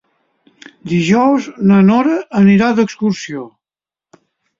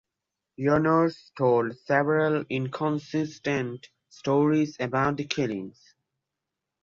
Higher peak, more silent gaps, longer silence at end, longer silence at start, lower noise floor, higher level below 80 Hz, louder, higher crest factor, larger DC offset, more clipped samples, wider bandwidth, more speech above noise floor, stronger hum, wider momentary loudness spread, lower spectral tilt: first, -2 dBFS vs -8 dBFS; neither; about the same, 1.1 s vs 1.15 s; first, 0.85 s vs 0.6 s; first, under -90 dBFS vs -86 dBFS; first, -54 dBFS vs -62 dBFS; first, -13 LUFS vs -26 LUFS; about the same, 14 dB vs 18 dB; neither; neither; about the same, 7.6 kHz vs 7.4 kHz; first, over 78 dB vs 60 dB; neither; first, 14 LU vs 8 LU; about the same, -7 dB/octave vs -7 dB/octave